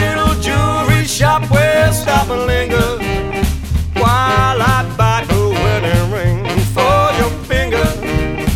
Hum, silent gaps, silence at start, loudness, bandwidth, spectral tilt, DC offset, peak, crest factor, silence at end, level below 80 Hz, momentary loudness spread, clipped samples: none; none; 0 s; -14 LUFS; 16.5 kHz; -5.5 dB/octave; under 0.1%; 0 dBFS; 14 dB; 0 s; -24 dBFS; 6 LU; under 0.1%